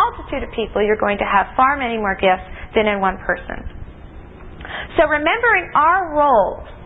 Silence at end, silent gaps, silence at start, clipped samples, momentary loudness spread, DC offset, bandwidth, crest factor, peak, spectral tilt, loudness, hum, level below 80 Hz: 0 s; none; 0 s; under 0.1%; 15 LU; under 0.1%; 4 kHz; 16 dB; -2 dBFS; -8.5 dB/octave; -17 LUFS; none; -38 dBFS